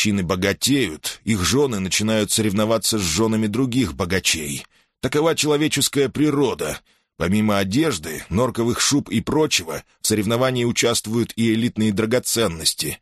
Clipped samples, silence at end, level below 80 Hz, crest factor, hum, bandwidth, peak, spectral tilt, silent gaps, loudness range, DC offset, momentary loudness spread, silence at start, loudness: under 0.1%; 0.05 s; -46 dBFS; 16 dB; none; 13 kHz; -4 dBFS; -4 dB/octave; none; 1 LU; under 0.1%; 6 LU; 0 s; -20 LUFS